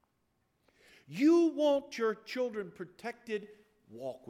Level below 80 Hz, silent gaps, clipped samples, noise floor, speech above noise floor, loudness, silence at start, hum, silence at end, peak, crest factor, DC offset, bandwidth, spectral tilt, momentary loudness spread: -78 dBFS; none; under 0.1%; -77 dBFS; 45 dB; -32 LUFS; 1.1 s; none; 0.1 s; -16 dBFS; 16 dB; under 0.1%; 12 kHz; -5.5 dB/octave; 18 LU